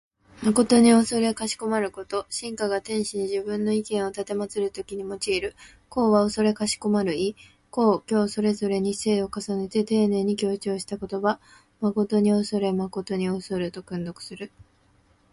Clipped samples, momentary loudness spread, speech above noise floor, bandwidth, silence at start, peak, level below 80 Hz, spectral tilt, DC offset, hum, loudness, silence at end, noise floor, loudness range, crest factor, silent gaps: under 0.1%; 11 LU; 37 dB; 11.5 kHz; 0.35 s; -6 dBFS; -58 dBFS; -5 dB/octave; under 0.1%; none; -25 LUFS; 0.85 s; -61 dBFS; 4 LU; 18 dB; none